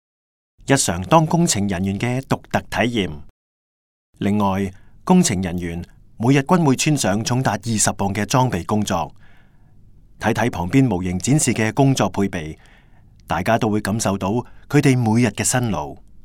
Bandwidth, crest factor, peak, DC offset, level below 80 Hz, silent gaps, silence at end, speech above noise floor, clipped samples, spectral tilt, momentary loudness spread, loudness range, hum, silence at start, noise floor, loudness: 17.5 kHz; 20 dB; 0 dBFS; under 0.1%; -48 dBFS; 3.30-4.13 s; 0.05 s; 29 dB; under 0.1%; -5 dB/octave; 10 LU; 3 LU; none; 0.65 s; -48 dBFS; -19 LUFS